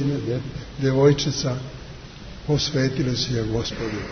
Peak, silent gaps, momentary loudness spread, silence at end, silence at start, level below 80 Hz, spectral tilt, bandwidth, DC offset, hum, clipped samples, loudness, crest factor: -4 dBFS; none; 19 LU; 0 s; 0 s; -42 dBFS; -5.5 dB/octave; 6.6 kHz; under 0.1%; none; under 0.1%; -23 LUFS; 18 dB